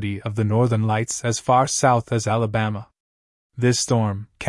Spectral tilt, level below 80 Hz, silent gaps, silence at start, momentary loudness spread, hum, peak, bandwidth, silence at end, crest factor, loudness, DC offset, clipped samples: -5 dB/octave; -54 dBFS; 3.00-3.50 s; 0 s; 7 LU; none; -4 dBFS; 12 kHz; 0 s; 18 dB; -21 LUFS; under 0.1%; under 0.1%